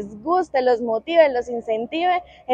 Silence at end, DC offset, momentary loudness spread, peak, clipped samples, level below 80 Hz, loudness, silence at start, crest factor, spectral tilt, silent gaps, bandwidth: 0 s; under 0.1%; 8 LU; -4 dBFS; under 0.1%; -58 dBFS; -21 LUFS; 0 s; 18 dB; -5 dB/octave; none; 8 kHz